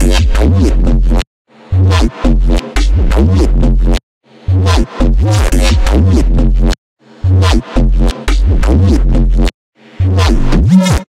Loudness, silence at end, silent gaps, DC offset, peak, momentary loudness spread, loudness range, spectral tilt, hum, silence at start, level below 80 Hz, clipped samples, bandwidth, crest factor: -12 LUFS; 0.05 s; 1.27-1.45 s, 4.03-4.21 s, 6.78-6.97 s, 9.54-9.72 s; under 0.1%; 0 dBFS; 6 LU; 1 LU; -6.5 dB/octave; none; 0 s; -12 dBFS; under 0.1%; 12 kHz; 10 dB